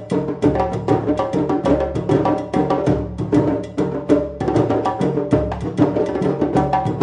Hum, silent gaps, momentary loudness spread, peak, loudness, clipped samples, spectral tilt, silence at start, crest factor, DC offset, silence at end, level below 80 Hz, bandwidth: none; none; 3 LU; -2 dBFS; -19 LUFS; under 0.1%; -8.5 dB/octave; 0 s; 16 dB; under 0.1%; 0 s; -38 dBFS; 9.8 kHz